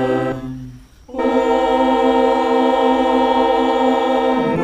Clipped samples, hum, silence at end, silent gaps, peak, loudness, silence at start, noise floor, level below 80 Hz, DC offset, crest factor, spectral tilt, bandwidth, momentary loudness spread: under 0.1%; none; 0 s; none; -2 dBFS; -16 LUFS; 0 s; -37 dBFS; -44 dBFS; under 0.1%; 14 dB; -6 dB/octave; 9.8 kHz; 9 LU